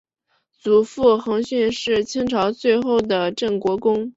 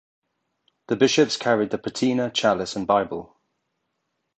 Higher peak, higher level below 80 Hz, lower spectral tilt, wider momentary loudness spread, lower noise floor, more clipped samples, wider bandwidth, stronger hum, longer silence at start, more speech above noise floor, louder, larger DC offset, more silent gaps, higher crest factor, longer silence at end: about the same, -2 dBFS vs -4 dBFS; first, -54 dBFS vs -62 dBFS; about the same, -5 dB/octave vs -4 dB/octave; second, 5 LU vs 9 LU; second, -69 dBFS vs -77 dBFS; neither; second, 8 kHz vs 9 kHz; neither; second, 0.65 s vs 0.9 s; second, 50 dB vs 55 dB; about the same, -20 LUFS vs -22 LUFS; neither; neither; about the same, 16 dB vs 20 dB; second, 0.05 s vs 1.15 s